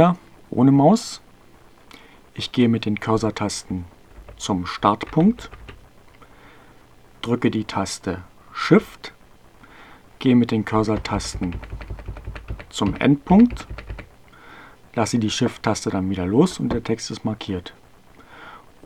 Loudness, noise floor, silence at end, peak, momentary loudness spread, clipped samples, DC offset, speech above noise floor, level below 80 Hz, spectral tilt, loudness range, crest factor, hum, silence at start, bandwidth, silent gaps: -21 LUFS; -50 dBFS; 0.3 s; 0 dBFS; 20 LU; under 0.1%; 0.2%; 30 dB; -42 dBFS; -6 dB/octave; 4 LU; 22 dB; none; 0 s; 13.5 kHz; none